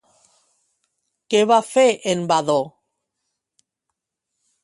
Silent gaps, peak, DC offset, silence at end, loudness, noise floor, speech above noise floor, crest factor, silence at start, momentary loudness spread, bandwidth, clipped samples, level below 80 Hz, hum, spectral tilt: none; -4 dBFS; under 0.1%; 1.95 s; -18 LUFS; -81 dBFS; 63 dB; 20 dB; 1.3 s; 7 LU; 11.5 kHz; under 0.1%; -70 dBFS; none; -4 dB/octave